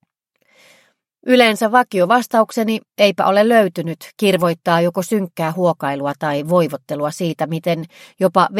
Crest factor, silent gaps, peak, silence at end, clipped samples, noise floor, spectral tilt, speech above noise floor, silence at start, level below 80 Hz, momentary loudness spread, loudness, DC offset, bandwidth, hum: 18 dB; none; 0 dBFS; 0 s; under 0.1%; -65 dBFS; -5.5 dB/octave; 48 dB; 1.25 s; -66 dBFS; 9 LU; -17 LUFS; under 0.1%; 16.5 kHz; none